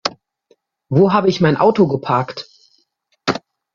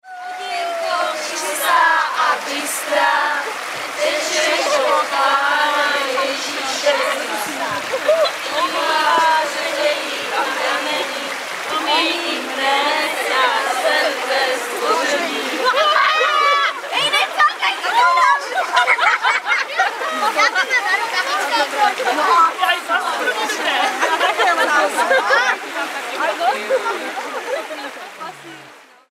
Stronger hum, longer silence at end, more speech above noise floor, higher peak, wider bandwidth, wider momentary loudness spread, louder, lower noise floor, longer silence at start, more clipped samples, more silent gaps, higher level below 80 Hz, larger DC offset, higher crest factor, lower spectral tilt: neither; about the same, 0.35 s vs 0.3 s; first, 50 dB vs 25 dB; about the same, -2 dBFS vs 0 dBFS; second, 7.4 kHz vs 16 kHz; first, 13 LU vs 9 LU; about the same, -16 LUFS vs -17 LUFS; first, -64 dBFS vs -43 dBFS; about the same, 0.05 s vs 0.05 s; neither; neither; first, -56 dBFS vs -74 dBFS; neither; about the same, 16 dB vs 18 dB; first, -6.5 dB/octave vs 0 dB/octave